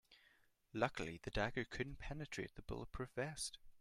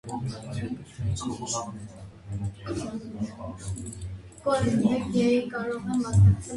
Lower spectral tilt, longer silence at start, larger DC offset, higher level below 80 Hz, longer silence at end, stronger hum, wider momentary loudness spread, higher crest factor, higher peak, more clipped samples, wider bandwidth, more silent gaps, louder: second, -4.5 dB/octave vs -6.5 dB/octave; about the same, 0.1 s vs 0.05 s; neither; second, -58 dBFS vs -42 dBFS; about the same, 0 s vs 0 s; neither; second, 8 LU vs 15 LU; first, 24 dB vs 18 dB; second, -22 dBFS vs -10 dBFS; neither; first, 15 kHz vs 11.5 kHz; neither; second, -45 LUFS vs -28 LUFS